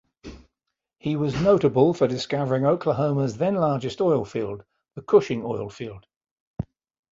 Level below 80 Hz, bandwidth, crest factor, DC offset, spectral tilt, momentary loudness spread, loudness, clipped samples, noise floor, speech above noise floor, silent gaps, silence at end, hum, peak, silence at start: -54 dBFS; 7.8 kHz; 20 dB; under 0.1%; -7.5 dB/octave; 18 LU; -23 LUFS; under 0.1%; -83 dBFS; 61 dB; 6.16-6.21 s, 6.31-6.54 s; 0.5 s; none; -4 dBFS; 0.25 s